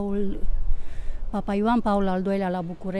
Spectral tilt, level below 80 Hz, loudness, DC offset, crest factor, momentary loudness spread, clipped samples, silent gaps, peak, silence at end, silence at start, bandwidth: -8.5 dB/octave; -28 dBFS; -26 LUFS; under 0.1%; 14 dB; 13 LU; under 0.1%; none; -8 dBFS; 0 s; 0 s; 5.2 kHz